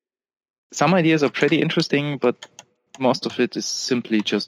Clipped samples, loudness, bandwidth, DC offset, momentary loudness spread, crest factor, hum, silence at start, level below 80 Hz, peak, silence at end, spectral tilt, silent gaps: under 0.1%; -20 LUFS; 13 kHz; under 0.1%; 6 LU; 18 dB; none; 0.7 s; -70 dBFS; -4 dBFS; 0 s; -5 dB/octave; none